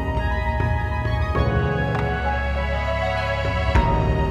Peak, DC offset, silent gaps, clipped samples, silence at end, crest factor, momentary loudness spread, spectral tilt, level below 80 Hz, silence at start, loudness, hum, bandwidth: -6 dBFS; under 0.1%; none; under 0.1%; 0 s; 14 dB; 4 LU; -7.5 dB/octave; -26 dBFS; 0 s; -22 LUFS; none; 8 kHz